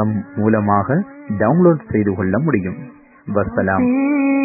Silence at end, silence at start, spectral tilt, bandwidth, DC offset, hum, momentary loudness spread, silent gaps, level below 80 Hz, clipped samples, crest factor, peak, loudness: 0 s; 0 s; -17 dB/octave; 2.7 kHz; under 0.1%; none; 9 LU; none; -42 dBFS; under 0.1%; 16 dB; 0 dBFS; -17 LUFS